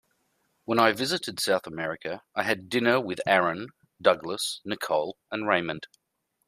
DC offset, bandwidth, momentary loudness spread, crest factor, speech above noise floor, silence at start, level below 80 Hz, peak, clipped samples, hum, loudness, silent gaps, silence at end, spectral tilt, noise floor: under 0.1%; 15.5 kHz; 11 LU; 24 dB; 46 dB; 0.7 s; -70 dBFS; -4 dBFS; under 0.1%; none; -27 LUFS; none; 0.6 s; -3.5 dB/octave; -72 dBFS